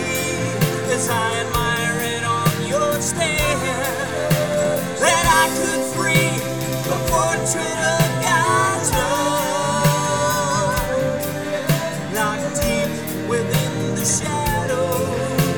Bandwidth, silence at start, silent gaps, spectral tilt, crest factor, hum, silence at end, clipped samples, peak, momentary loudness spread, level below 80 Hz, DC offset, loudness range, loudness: over 20 kHz; 0 s; none; -4 dB/octave; 18 dB; none; 0 s; under 0.1%; -2 dBFS; 5 LU; -38 dBFS; 0.5%; 3 LU; -19 LUFS